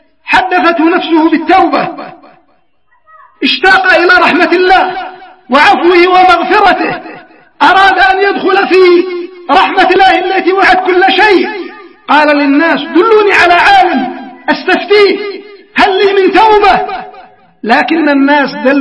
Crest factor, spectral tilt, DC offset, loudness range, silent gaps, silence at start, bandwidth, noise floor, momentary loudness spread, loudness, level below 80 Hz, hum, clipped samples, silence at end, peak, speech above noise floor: 8 dB; -4 dB/octave; 0.2%; 2 LU; none; 0.25 s; 11 kHz; -55 dBFS; 12 LU; -7 LUFS; -40 dBFS; none; 2%; 0 s; 0 dBFS; 48 dB